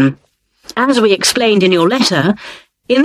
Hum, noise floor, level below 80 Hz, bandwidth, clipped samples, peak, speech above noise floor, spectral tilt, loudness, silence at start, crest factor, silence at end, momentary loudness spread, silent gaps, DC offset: none; -55 dBFS; -54 dBFS; 14 kHz; under 0.1%; 0 dBFS; 43 dB; -4 dB/octave; -12 LUFS; 0 s; 14 dB; 0 s; 11 LU; none; under 0.1%